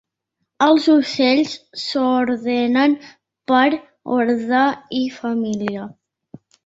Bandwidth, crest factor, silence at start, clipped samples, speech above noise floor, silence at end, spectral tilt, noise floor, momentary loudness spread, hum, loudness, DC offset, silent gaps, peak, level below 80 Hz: 8 kHz; 16 dB; 0.6 s; under 0.1%; 59 dB; 0.75 s; -5 dB/octave; -76 dBFS; 11 LU; none; -18 LUFS; under 0.1%; none; -2 dBFS; -64 dBFS